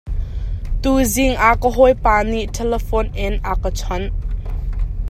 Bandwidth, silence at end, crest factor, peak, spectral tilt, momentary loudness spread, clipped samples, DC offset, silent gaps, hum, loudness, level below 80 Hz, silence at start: 15 kHz; 0 s; 16 dB; 0 dBFS; -5 dB/octave; 13 LU; under 0.1%; under 0.1%; none; none; -19 LUFS; -22 dBFS; 0.05 s